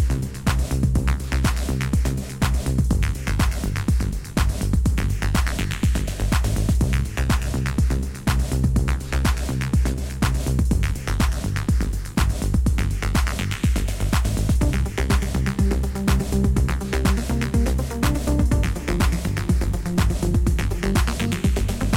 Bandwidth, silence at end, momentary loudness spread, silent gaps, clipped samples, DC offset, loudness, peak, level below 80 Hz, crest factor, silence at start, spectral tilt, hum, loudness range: 16.5 kHz; 0 s; 3 LU; none; under 0.1%; under 0.1%; -23 LUFS; -6 dBFS; -24 dBFS; 16 dB; 0 s; -5.5 dB/octave; none; 1 LU